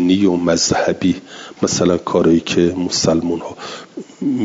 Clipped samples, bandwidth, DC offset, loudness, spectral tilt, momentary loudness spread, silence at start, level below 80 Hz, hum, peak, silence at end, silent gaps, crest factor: under 0.1%; 7.8 kHz; under 0.1%; -16 LUFS; -4.5 dB/octave; 16 LU; 0 s; -50 dBFS; none; -2 dBFS; 0 s; none; 14 dB